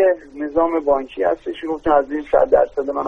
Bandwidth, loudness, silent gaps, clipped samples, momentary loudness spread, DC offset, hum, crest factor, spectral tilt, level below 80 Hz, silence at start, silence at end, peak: 6.2 kHz; -19 LUFS; none; under 0.1%; 9 LU; under 0.1%; none; 16 dB; -7 dB/octave; -46 dBFS; 0 s; 0 s; -2 dBFS